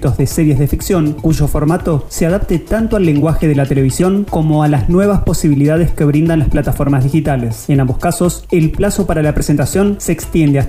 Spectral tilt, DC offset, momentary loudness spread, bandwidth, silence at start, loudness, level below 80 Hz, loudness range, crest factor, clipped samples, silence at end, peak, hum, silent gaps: -7 dB/octave; under 0.1%; 3 LU; 16 kHz; 0 s; -13 LUFS; -24 dBFS; 2 LU; 10 dB; under 0.1%; 0 s; -2 dBFS; none; none